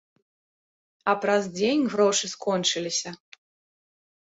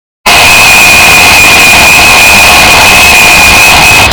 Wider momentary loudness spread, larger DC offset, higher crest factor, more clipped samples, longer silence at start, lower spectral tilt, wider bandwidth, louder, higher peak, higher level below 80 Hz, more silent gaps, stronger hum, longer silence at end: first, 7 LU vs 1 LU; second, under 0.1% vs 4%; first, 20 dB vs 2 dB; second, under 0.1% vs 30%; first, 1.05 s vs 0.25 s; first, -3 dB/octave vs -1 dB/octave; second, 8.2 kHz vs over 20 kHz; second, -24 LUFS vs 1 LUFS; second, -6 dBFS vs 0 dBFS; second, -72 dBFS vs -22 dBFS; neither; neither; first, 1.15 s vs 0 s